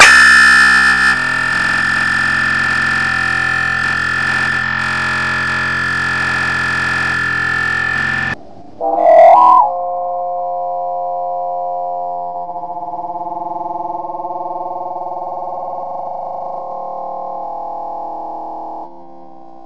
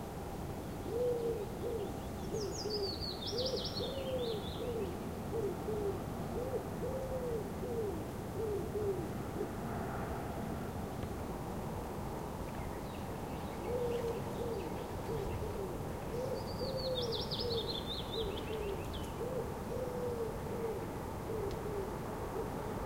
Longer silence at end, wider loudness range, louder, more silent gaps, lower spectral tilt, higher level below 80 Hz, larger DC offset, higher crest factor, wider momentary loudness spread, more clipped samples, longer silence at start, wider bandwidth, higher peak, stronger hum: about the same, 0 s vs 0 s; first, 12 LU vs 3 LU; first, -13 LUFS vs -39 LUFS; neither; second, -2.5 dB/octave vs -5.5 dB/octave; first, -42 dBFS vs -50 dBFS; neither; about the same, 14 dB vs 14 dB; first, 17 LU vs 6 LU; neither; about the same, 0 s vs 0 s; second, 11 kHz vs 16 kHz; first, 0 dBFS vs -26 dBFS; neither